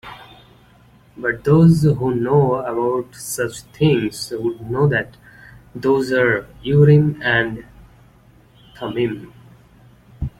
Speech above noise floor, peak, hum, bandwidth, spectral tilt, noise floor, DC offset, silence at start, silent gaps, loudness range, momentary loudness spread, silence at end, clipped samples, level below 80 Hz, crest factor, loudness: 33 dB; -2 dBFS; none; 15.5 kHz; -6.5 dB/octave; -50 dBFS; under 0.1%; 0.05 s; none; 4 LU; 15 LU; 0.1 s; under 0.1%; -46 dBFS; 16 dB; -18 LUFS